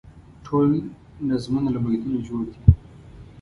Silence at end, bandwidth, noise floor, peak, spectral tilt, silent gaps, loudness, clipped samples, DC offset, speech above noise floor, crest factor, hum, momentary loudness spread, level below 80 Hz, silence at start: 0 s; 11 kHz; -44 dBFS; 0 dBFS; -9.5 dB/octave; none; -23 LUFS; under 0.1%; under 0.1%; 23 dB; 22 dB; none; 10 LU; -32 dBFS; 0.05 s